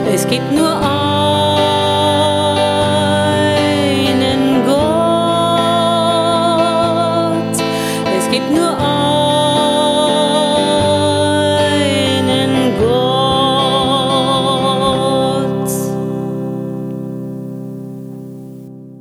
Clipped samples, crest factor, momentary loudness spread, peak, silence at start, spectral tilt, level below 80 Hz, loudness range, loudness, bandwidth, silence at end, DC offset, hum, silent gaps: under 0.1%; 12 dB; 11 LU; -2 dBFS; 0 s; -5 dB/octave; -44 dBFS; 4 LU; -13 LUFS; 16 kHz; 0 s; under 0.1%; none; none